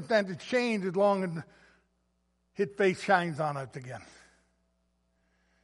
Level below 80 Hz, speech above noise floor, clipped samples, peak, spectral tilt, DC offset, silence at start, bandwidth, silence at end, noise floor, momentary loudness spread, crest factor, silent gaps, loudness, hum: -72 dBFS; 45 dB; under 0.1%; -10 dBFS; -6 dB/octave; under 0.1%; 0 s; 11.5 kHz; 1.6 s; -75 dBFS; 16 LU; 22 dB; none; -29 LUFS; none